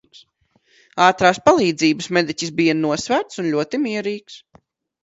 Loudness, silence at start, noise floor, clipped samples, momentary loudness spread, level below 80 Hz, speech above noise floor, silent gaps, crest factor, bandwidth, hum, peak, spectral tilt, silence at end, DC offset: -18 LUFS; 0.95 s; -62 dBFS; under 0.1%; 10 LU; -58 dBFS; 44 dB; none; 20 dB; 8 kHz; none; 0 dBFS; -4.5 dB/octave; 0.65 s; under 0.1%